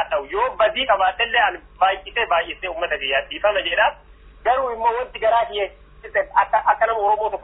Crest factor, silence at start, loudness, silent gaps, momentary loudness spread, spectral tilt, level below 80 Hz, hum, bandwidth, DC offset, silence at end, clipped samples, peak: 16 dB; 0 s; -20 LUFS; none; 6 LU; -6 dB/octave; -48 dBFS; none; 4 kHz; under 0.1%; 0 s; under 0.1%; -4 dBFS